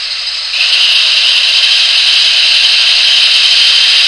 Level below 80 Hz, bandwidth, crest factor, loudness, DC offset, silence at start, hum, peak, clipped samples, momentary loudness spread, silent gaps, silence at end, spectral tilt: -50 dBFS; 11 kHz; 8 dB; -5 LUFS; under 0.1%; 0 s; none; 0 dBFS; 0.6%; 5 LU; none; 0 s; 4 dB/octave